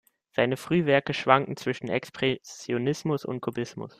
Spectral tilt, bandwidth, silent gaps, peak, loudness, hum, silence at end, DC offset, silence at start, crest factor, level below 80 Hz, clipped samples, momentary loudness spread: -5.5 dB/octave; 15 kHz; none; -4 dBFS; -27 LUFS; none; 0.1 s; under 0.1%; 0.4 s; 24 dB; -64 dBFS; under 0.1%; 10 LU